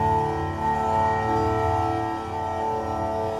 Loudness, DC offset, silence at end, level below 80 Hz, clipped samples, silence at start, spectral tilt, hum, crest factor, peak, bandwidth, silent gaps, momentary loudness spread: -25 LUFS; under 0.1%; 0 s; -42 dBFS; under 0.1%; 0 s; -7 dB/octave; none; 12 dB; -12 dBFS; 15 kHz; none; 5 LU